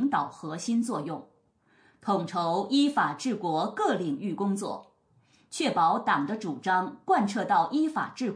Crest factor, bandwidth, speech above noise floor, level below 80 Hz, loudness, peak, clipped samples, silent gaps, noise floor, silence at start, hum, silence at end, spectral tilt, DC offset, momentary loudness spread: 16 dB; 10.5 kHz; 38 dB; -80 dBFS; -28 LUFS; -12 dBFS; under 0.1%; none; -65 dBFS; 0 s; none; 0 s; -5 dB/octave; under 0.1%; 10 LU